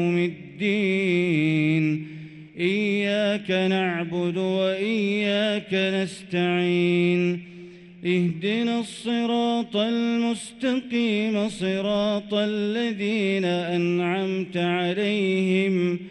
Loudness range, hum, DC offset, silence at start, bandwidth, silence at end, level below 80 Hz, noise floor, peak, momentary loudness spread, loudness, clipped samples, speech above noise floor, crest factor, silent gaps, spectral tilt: 1 LU; none; under 0.1%; 0 s; 11.5 kHz; 0 s; -66 dBFS; -43 dBFS; -10 dBFS; 6 LU; -24 LUFS; under 0.1%; 20 dB; 12 dB; none; -6.5 dB/octave